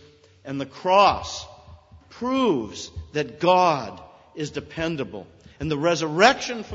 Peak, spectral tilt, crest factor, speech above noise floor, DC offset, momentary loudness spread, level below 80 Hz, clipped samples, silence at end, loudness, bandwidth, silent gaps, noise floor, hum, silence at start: 0 dBFS; -4.5 dB/octave; 24 dB; 25 dB; under 0.1%; 17 LU; -50 dBFS; under 0.1%; 0 s; -22 LUFS; 8 kHz; none; -48 dBFS; none; 0.45 s